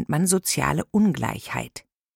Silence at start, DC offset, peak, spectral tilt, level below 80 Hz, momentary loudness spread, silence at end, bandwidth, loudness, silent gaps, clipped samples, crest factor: 0 s; under 0.1%; -6 dBFS; -4.5 dB/octave; -50 dBFS; 12 LU; 0.35 s; 17 kHz; -23 LUFS; none; under 0.1%; 18 dB